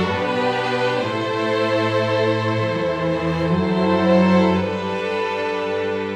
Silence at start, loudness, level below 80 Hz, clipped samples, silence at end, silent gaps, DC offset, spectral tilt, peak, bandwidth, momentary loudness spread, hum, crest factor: 0 s; -20 LUFS; -50 dBFS; under 0.1%; 0 s; none; under 0.1%; -7 dB/octave; -4 dBFS; 9.4 kHz; 7 LU; none; 14 dB